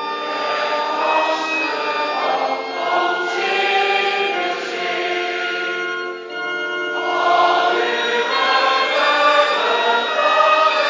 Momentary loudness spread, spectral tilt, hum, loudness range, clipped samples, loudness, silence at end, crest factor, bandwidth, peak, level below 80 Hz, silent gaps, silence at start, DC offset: 8 LU; -1.5 dB/octave; none; 4 LU; under 0.1%; -18 LUFS; 0 s; 16 dB; 7.6 kHz; -2 dBFS; -78 dBFS; none; 0 s; under 0.1%